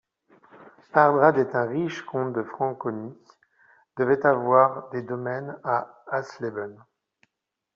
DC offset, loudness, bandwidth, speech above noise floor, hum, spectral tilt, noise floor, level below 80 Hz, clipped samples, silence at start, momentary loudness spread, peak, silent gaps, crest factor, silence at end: under 0.1%; -24 LUFS; 7.2 kHz; 59 dB; none; -6 dB/octave; -83 dBFS; -70 dBFS; under 0.1%; 0.55 s; 14 LU; -4 dBFS; none; 22 dB; 1 s